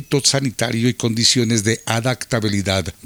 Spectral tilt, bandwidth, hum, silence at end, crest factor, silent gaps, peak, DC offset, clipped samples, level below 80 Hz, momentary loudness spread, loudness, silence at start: -3.5 dB/octave; over 20 kHz; none; 0.15 s; 18 dB; none; 0 dBFS; under 0.1%; under 0.1%; -50 dBFS; 6 LU; -18 LUFS; 0 s